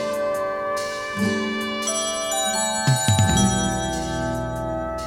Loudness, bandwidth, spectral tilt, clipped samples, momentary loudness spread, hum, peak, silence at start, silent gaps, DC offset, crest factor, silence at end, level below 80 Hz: -22 LUFS; 16.5 kHz; -4 dB/octave; under 0.1%; 8 LU; none; -4 dBFS; 0 s; none; under 0.1%; 18 dB; 0 s; -38 dBFS